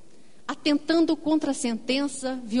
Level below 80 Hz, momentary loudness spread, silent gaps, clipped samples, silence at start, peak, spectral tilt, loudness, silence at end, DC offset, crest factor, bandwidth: -64 dBFS; 9 LU; none; under 0.1%; 0.5 s; -10 dBFS; -3.5 dB/octave; -25 LUFS; 0 s; 0.8%; 16 dB; 11 kHz